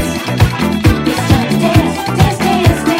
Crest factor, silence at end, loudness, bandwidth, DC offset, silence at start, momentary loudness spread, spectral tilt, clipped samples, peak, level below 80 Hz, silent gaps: 12 dB; 0 s; -12 LUFS; 16.5 kHz; under 0.1%; 0 s; 3 LU; -6 dB/octave; 0.1%; 0 dBFS; -24 dBFS; none